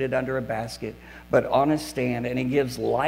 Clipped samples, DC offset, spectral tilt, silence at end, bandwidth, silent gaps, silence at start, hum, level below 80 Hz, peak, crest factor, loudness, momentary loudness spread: under 0.1%; under 0.1%; -6 dB/octave; 0 s; 16 kHz; none; 0 s; none; -50 dBFS; -8 dBFS; 18 dB; -25 LUFS; 12 LU